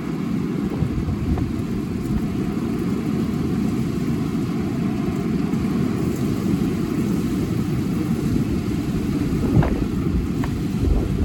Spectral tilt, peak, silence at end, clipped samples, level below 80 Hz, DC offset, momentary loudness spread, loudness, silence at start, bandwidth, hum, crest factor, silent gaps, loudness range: -8 dB/octave; -4 dBFS; 0 s; under 0.1%; -32 dBFS; under 0.1%; 2 LU; -23 LUFS; 0 s; 18 kHz; none; 18 dB; none; 2 LU